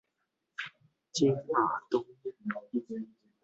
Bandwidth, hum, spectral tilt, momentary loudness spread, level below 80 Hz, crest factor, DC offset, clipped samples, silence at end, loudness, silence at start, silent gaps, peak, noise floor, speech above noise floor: 8.2 kHz; none; -5 dB/octave; 15 LU; -76 dBFS; 20 dB; under 0.1%; under 0.1%; 0.35 s; -33 LUFS; 0.6 s; none; -14 dBFS; -83 dBFS; 52 dB